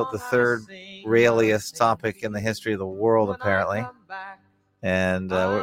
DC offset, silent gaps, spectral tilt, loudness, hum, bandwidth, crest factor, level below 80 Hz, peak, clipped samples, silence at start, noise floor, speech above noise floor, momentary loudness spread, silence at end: under 0.1%; none; -5.5 dB/octave; -23 LUFS; none; 16.5 kHz; 20 dB; -58 dBFS; -4 dBFS; under 0.1%; 0 s; -57 dBFS; 34 dB; 17 LU; 0 s